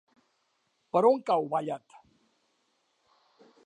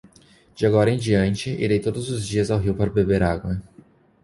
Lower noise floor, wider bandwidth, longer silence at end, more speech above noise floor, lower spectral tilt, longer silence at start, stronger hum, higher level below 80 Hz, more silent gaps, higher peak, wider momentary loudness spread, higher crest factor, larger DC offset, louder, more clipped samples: first, -75 dBFS vs -53 dBFS; second, 9.8 kHz vs 11.5 kHz; first, 1.9 s vs 0.6 s; first, 48 dB vs 33 dB; about the same, -7 dB/octave vs -6.5 dB/octave; first, 0.95 s vs 0.55 s; neither; second, -84 dBFS vs -40 dBFS; neither; second, -10 dBFS vs -4 dBFS; first, 13 LU vs 8 LU; about the same, 22 dB vs 18 dB; neither; second, -27 LUFS vs -22 LUFS; neither